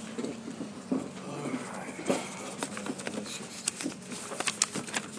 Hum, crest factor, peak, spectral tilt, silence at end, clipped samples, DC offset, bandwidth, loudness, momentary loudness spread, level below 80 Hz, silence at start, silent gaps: none; 32 dB; -4 dBFS; -2.5 dB/octave; 0 s; under 0.1%; under 0.1%; 11 kHz; -35 LUFS; 10 LU; -76 dBFS; 0 s; none